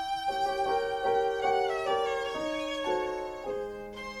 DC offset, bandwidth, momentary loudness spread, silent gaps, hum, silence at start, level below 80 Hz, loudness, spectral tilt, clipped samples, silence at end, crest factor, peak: under 0.1%; 15.5 kHz; 8 LU; none; none; 0 s; -56 dBFS; -31 LUFS; -3.5 dB/octave; under 0.1%; 0 s; 14 dB; -16 dBFS